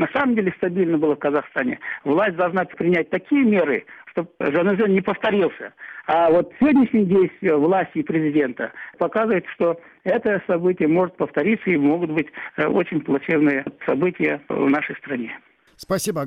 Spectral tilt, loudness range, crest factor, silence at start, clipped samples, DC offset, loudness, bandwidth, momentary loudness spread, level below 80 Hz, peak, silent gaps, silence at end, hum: -6.5 dB/octave; 3 LU; 12 dB; 0 s; under 0.1%; under 0.1%; -21 LUFS; 15 kHz; 9 LU; -60 dBFS; -8 dBFS; none; 0 s; none